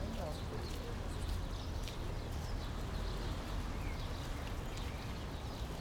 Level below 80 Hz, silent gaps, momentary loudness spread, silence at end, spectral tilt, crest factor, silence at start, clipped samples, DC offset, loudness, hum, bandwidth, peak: -44 dBFS; none; 2 LU; 0 s; -5.5 dB/octave; 14 dB; 0 s; under 0.1%; under 0.1%; -43 LUFS; none; 18.5 kHz; -26 dBFS